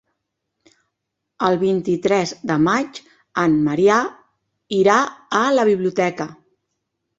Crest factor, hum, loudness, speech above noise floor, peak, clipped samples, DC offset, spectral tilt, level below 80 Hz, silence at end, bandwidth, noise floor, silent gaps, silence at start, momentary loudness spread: 18 dB; none; -18 LUFS; 61 dB; -2 dBFS; under 0.1%; under 0.1%; -5.5 dB/octave; -60 dBFS; 0.85 s; 8 kHz; -79 dBFS; none; 1.4 s; 13 LU